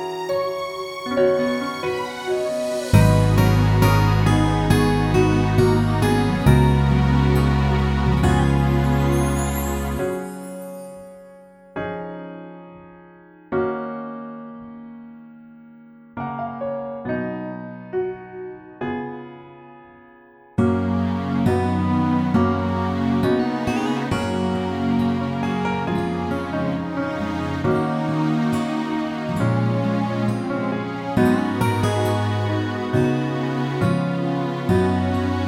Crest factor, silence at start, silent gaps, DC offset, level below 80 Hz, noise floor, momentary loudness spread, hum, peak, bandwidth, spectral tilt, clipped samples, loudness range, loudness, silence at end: 20 dB; 0 s; none; under 0.1%; -32 dBFS; -49 dBFS; 16 LU; none; -2 dBFS; 16 kHz; -7 dB/octave; under 0.1%; 13 LU; -21 LUFS; 0 s